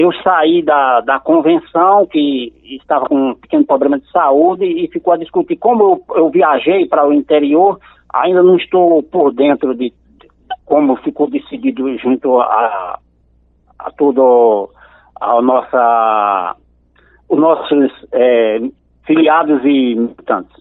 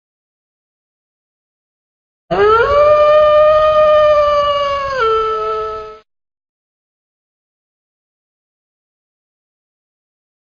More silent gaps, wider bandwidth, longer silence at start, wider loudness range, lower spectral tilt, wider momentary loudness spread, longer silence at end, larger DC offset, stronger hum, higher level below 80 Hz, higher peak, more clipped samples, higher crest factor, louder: neither; second, 4.1 kHz vs 7 kHz; second, 0 s vs 2.3 s; second, 4 LU vs 11 LU; first, -10 dB/octave vs -5 dB/octave; about the same, 9 LU vs 11 LU; second, 0.15 s vs 4.45 s; neither; neither; second, -54 dBFS vs -42 dBFS; about the same, 0 dBFS vs 0 dBFS; neither; about the same, 12 dB vs 16 dB; about the same, -12 LUFS vs -11 LUFS